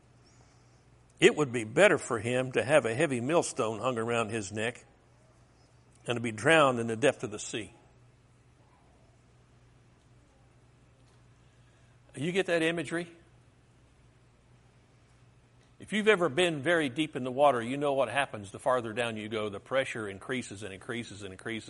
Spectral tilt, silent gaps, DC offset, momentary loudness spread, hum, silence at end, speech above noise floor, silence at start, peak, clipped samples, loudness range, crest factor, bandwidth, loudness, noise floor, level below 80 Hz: -4.5 dB/octave; none; under 0.1%; 14 LU; none; 0 s; 32 dB; 1.2 s; -6 dBFS; under 0.1%; 9 LU; 26 dB; 11.5 kHz; -29 LUFS; -62 dBFS; -68 dBFS